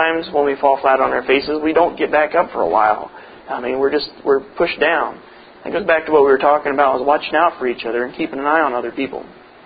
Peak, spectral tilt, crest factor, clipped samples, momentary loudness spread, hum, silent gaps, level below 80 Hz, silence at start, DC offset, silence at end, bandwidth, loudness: 0 dBFS; -9.5 dB/octave; 16 dB; under 0.1%; 10 LU; none; none; -52 dBFS; 0 s; under 0.1%; 0.35 s; 5 kHz; -17 LUFS